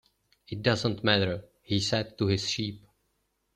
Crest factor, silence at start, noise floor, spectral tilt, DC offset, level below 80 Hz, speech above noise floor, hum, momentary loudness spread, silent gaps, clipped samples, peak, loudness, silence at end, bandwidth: 22 dB; 0.5 s; -76 dBFS; -5 dB/octave; under 0.1%; -60 dBFS; 48 dB; none; 10 LU; none; under 0.1%; -8 dBFS; -28 LUFS; 0.8 s; 11 kHz